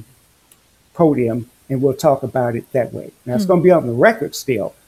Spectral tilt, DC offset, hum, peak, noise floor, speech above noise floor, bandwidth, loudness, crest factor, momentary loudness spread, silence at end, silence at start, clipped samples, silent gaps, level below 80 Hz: -6.5 dB/octave; under 0.1%; none; 0 dBFS; -53 dBFS; 37 dB; 15.5 kHz; -17 LUFS; 18 dB; 13 LU; 0.15 s; 0 s; under 0.1%; none; -56 dBFS